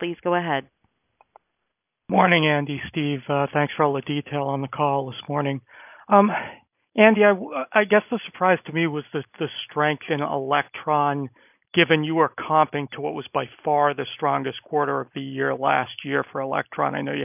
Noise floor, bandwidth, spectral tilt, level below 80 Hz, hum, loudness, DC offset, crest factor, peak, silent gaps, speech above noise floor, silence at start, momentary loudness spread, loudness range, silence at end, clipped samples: -79 dBFS; 3.7 kHz; -9.5 dB/octave; -66 dBFS; none; -23 LUFS; under 0.1%; 22 dB; 0 dBFS; none; 57 dB; 0 s; 11 LU; 4 LU; 0 s; under 0.1%